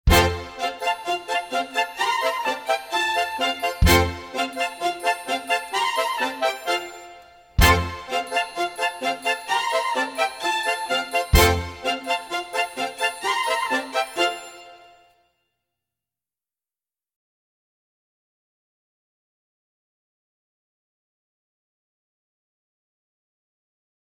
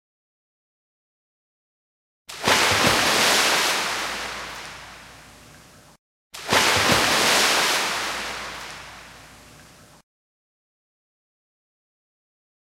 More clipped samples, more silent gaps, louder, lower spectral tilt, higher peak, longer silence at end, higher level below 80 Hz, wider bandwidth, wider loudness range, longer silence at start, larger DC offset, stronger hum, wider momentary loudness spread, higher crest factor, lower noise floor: neither; second, none vs 5.99-6.30 s; second, -23 LUFS vs -19 LUFS; first, -3.5 dB/octave vs -1 dB/octave; about the same, -2 dBFS vs -4 dBFS; first, 9.35 s vs 3.5 s; first, -34 dBFS vs -54 dBFS; about the same, 17 kHz vs 16 kHz; second, 4 LU vs 8 LU; second, 0.05 s vs 2.3 s; neither; neither; second, 9 LU vs 21 LU; about the same, 22 dB vs 22 dB; first, under -90 dBFS vs -49 dBFS